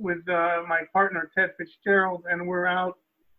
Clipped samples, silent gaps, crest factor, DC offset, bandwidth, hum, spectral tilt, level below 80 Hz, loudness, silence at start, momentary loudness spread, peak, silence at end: under 0.1%; none; 16 dB; under 0.1%; 4.5 kHz; none; -8.5 dB/octave; -68 dBFS; -25 LUFS; 0 s; 6 LU; -10 dBFS; 0.45 s